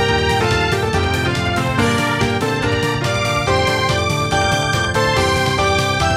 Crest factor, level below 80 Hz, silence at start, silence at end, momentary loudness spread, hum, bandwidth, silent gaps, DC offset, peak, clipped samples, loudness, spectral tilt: 14 dB; -34 dBFS; 0 s; 0 s; 2 LU; none; 16 kHz; none; under 0.1%; -4 dBFS; under 0.1%; -16 LUFS; -4.5 dB/octave